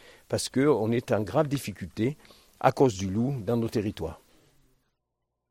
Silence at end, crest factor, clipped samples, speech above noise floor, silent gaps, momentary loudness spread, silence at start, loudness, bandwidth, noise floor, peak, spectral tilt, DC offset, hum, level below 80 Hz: 1.35 s; 22 dB; under 0.1%; 55 dB; none; 10 LU; 0.3 s; -27 LUFS; 16.5 kHz; -82 dBFS; -6 dBFS; -6 dB/octave; under 0.1%; none; -58 dBFS